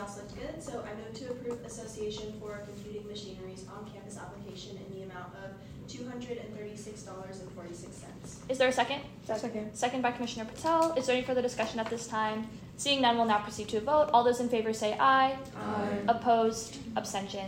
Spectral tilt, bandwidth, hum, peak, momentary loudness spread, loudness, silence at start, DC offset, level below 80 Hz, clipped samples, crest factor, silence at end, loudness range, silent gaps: -4 dB/octave; 16 kHz; none; -10 dBFS; 19 LU; -31 LUFS; 0 s; under 0.1%; -60 dBFS; under 0.1%; 22 dB; 0 s; 15 LU; none